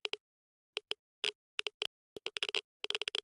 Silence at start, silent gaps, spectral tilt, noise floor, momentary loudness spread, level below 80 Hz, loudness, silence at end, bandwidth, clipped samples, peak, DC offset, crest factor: 0.05 s; 0.20-0.73 s, 0.99-1.22 s, 1.35-1.58 s, 1.74-1.80 s, 1.87-2.16 s, 2.64-2.80 s; 0.5 dB/octave; under -90 dBFS; 9 LU; -88 dBFS; -39 LUFS; 0.05 s; 11.5 kHz; under 0.1%; -16 dBFS; under 0.1%; 24 dB